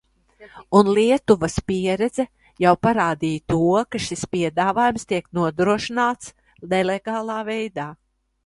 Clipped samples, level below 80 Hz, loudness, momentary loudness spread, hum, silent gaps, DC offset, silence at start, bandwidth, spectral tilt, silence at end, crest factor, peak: under 0.1%; -50 dBFS; -21 LUFS; 10 LU; none; none; under 0.1%; 0.4 s; 11.5 kHz; -5.5 dB/octave; 0.5 s; 20 dB; 0 dBFS